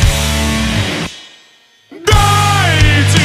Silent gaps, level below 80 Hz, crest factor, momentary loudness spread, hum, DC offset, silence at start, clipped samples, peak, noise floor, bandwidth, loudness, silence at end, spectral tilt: none; -20 dBFS; 12 dB; 11 LU; none; under 0.1%; 0 s; under 0.1%; 0 dBFS; -47 dBFS; 15.5 kHz; -12 LUFS; 0 s; -4 dB/octave